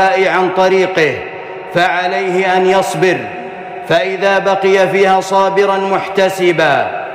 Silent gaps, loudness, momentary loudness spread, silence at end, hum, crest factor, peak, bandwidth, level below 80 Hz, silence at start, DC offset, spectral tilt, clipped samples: none; -12 LUFS; 9 LU; 0 s; none; 10 dB; -2 dBFS; 15 kHz; -54 dBFS; 0 s; under 0.1%; -4.5 dB/octave; under 0.1%